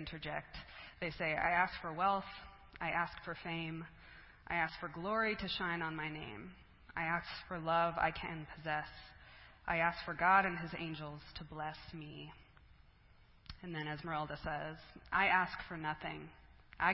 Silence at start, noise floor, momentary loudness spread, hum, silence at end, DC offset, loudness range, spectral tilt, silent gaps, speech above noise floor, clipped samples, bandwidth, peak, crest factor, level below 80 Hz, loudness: 0 s; -64 dBFS; 20 LU; none; 0 s; under 0.1%; 9 LU; -2.5 dB/octave; none; 26 dB; under 0.1%; 5.6 kHz; -16 dBFS; 22 dB; -60 dBFS; -38 LUFS